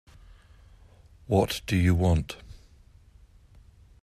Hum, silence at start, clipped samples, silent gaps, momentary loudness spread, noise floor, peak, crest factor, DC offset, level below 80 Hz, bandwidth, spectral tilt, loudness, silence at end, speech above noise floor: none; 1.3 s; under 0.1%; none; 13 LU; -55 dBFS; -8 dBFS; 20 dB; under 0.1%; -46 dBFS; 15 kHz; -6.5 dB/octave; -26 LUFS; 1.5 s; 31 dB